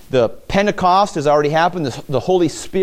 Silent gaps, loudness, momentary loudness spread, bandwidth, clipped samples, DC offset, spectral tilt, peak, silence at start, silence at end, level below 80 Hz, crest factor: none; -16 LUFS; 6 LU; 16 kHz; under 0.1%; under 0.1%; -5.5 dB/octave; -2 dBFS; 0.05 s; 0 s; -42 dBFS; 14 dB